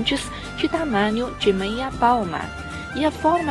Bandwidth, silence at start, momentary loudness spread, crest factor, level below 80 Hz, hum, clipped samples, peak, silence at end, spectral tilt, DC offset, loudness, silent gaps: 12 kHz; 0 s; 10 LU; 18 dB; -42 dBFS; none; under 0.1%; -4 dBFS; 0 s; -5 dB/octave; under 0.1%; -22 LUFS; none